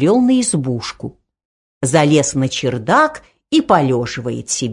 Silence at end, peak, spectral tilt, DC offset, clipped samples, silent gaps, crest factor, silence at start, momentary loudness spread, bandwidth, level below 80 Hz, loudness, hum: 0 s; 0 dBFS; -4.5 dB/octave; under 0.1%; under 0.1%; 1.45-1.81 s; 16 dB; 0 s; 11 LU; 11 kHz; -50 dBFS; -16 LUFS; none